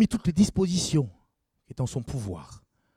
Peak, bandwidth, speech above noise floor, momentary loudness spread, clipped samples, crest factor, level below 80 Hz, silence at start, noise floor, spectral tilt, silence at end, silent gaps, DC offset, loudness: -10 dBFS; 14.5 kHz; 45 dB; 14 LU; under 0.1%; 18 dB; -48 dBFS; 0 s; -72 dBFS; -6 dB/octave; 0.4 s; none; under 0.1%; -27 LUFS